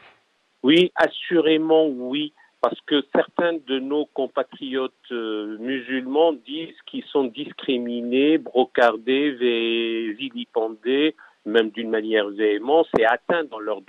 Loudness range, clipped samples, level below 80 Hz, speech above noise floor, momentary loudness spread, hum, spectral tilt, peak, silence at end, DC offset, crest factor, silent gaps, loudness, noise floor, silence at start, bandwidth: 5 LU; under 0.1%; -68 dBFS; 42 dB; 10 LU; none; -6 dB/octave; -4 dBFS; 0.05 s; under 0.1%; 18 dB; none; -22 LUFS; -64 dBFS; 0.65 s; 8 kHz